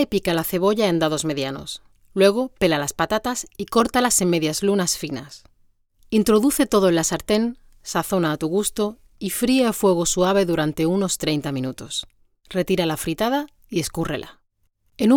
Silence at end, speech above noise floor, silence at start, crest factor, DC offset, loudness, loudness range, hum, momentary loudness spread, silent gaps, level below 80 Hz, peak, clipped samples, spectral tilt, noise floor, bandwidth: 0 s; 45 dB; 0 s; 16 dB; under 0.1%; -21 LUFS; 4 LU; none; 11 LU; none; -48 dBFS; -4 dBFS; under 0.1%; -4 dB/octave; -66 dBFS; over 20 kHz